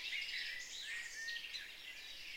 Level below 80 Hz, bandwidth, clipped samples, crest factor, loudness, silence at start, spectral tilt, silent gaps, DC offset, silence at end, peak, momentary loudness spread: -72 dBFS; 16 kHz; under 0.1%; 16 dB; -44 LUFS; 0 s; 2 dB/octave; none; under 0.1%; 0 s; -30 dBFS; 8 LU